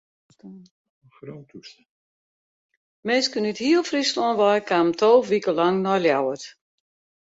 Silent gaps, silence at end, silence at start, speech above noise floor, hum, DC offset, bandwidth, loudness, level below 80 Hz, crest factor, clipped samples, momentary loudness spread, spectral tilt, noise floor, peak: 0.71-1.02 s, 1.90-2.69 s, 2.77-3.03 s; 0.8 s; 0.45 s; over 68 dB; none; under 0.1%; 8 kHz; -21 LUFS; -70 dBFS; 18 dB; under 0.1%; 22 LU; -4.5 dB/octave; under -90 dBFS; -6 dBFS